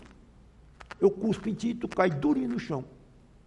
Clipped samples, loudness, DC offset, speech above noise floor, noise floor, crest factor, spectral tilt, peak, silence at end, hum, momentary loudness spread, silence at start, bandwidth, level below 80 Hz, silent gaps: under 0.1%; -29 LUFS; under 0.1%; 27 dB; -55 dBFS; 20 dB; -7 dB/octave; -10 dBFS; 0.55 s; none; 11 LU; 0 s; 11 kHz; -56 dBFS; none